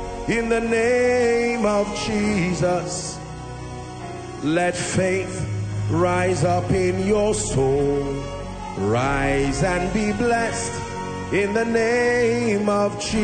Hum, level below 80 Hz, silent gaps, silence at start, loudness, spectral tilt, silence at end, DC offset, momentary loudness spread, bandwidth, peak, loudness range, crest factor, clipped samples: none; -38 dBFS; none; 0 s; -21 LUFS; -5 dB/octave; 0 s; under 0.1%; 12 LU; 9.4 kHz; -6 dBFS; 3 LU; 14 dB; under 0.1%